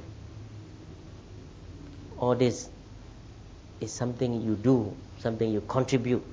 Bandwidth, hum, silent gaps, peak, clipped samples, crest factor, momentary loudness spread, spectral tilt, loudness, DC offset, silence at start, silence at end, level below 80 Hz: 8 kHz; none; none; -10 dBFS; under 0.1%; 22 dB; 22 LU; -6.5 dB/octave; -29 LUFS; under 0.1%; 0 s; 0 s; -52 dBFS